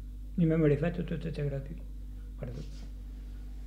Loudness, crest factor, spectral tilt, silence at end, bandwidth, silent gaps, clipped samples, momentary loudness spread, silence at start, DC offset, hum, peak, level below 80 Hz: -32 LUFS; 20 dB; -9 dB/octave; 0 s; 8.6 kHz; none; under 0.1%; 19 LU; 0 s; under 0.1%; none; -14 dBFS; -42 dBFS